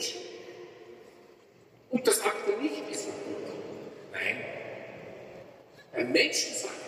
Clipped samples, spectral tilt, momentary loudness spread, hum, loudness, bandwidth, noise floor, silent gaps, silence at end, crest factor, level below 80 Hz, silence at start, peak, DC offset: under 0.1%; -2 dB/octave; 23 LU; none; -30 LUFS; 15.5 kHz; -58 dBFS; none; 0 s; 22 dB; -80 dBFS; 0 s; -12 dBFS; under 0.1%